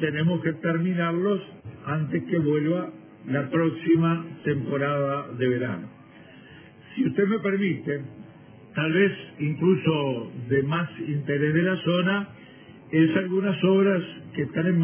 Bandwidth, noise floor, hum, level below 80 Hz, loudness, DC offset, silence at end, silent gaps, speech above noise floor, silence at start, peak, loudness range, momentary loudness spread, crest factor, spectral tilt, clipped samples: 3.5 kHz; -48 dBFS; none; -62 dBFS; -25 LUFS; under 0.1%; 0 s; none; 24 dB; 0 s; -8 dBFS; 4 LU; 10 LU; 18 dB; -11 dB/octave; under 0.1%